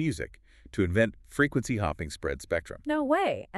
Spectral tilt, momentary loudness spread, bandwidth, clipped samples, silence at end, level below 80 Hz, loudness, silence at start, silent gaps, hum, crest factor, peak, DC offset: -6 dB/octave; 9 LU; 13 kHz; under 0.1%; 0 s; -48 dBFS; -29 LUFS; 0 s; none; none; 20 dB; -10 dBFS; under 0.1%